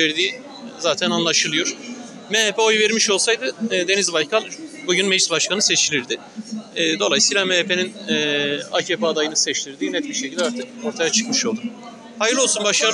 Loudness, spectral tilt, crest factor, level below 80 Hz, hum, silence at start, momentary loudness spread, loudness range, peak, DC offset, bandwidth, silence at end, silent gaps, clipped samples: -19 LUFS; -1.5 dB/octave; 16 dB; -74 dBFS; none; 0 s; 13 LU; 3 LU; -4 dBFS; under 0.1%; 11.5 kHz; 0 s; none; under 0.1%